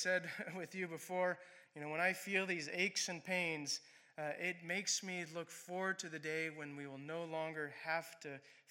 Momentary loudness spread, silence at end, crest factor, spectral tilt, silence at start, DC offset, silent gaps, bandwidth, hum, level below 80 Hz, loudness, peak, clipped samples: 12 LU; 0.1 s; 22 dB; -2.5 dB/octave; 0 s; under 0.1%; none; 16.5 kHz; none; under -90 dBFS; -41 LUFS; -22 dBFS; under 0.1%